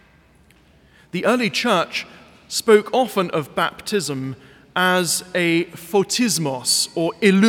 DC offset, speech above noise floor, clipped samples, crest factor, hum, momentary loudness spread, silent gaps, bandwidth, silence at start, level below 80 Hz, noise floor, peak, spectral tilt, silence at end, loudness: under 0.1%; 34 dB; under 0.1%; 20 dB; none; 11 LU; none; 18.5 kHz; 1.15 s; -62 dBFS; -53 dBFS; -2 dBFS; -3.5 dB/octave; 0 s; -20 LUFS